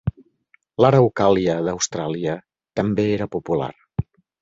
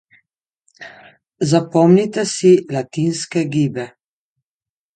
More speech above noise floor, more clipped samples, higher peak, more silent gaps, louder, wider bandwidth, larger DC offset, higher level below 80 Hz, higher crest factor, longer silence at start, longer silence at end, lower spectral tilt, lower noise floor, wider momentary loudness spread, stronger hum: second, 42 dB vs over 74 dB; neither; about the same, -2 dBFS vs 0 dBFS; neither; second, -21 LUFS vs -16 LUFS; second, 8 kHz vs 9.4 kHz; neither; first, -46 dBFS vs -62 dBFS; about the same, 20 dB vs 18 dB; second, 0.05 s vs 0.8 s; second, 0.4 s vs 1.1 s; about the same, -6 dB/octave vs -6 dB/octave; second, -61 dBFS vs under -90 dBFS; second, 14 LU vs 20 LU; neither